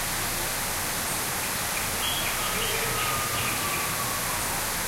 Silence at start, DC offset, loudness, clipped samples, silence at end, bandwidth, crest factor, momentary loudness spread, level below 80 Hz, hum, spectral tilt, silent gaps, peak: 0 s; under 0.1%; -26 LUFS; under 0.1%; 0 s; 16 kHz; 14 dB; 2 LU; -44 dBFS; none; -1.5 dB/octave; none; -14 dBFS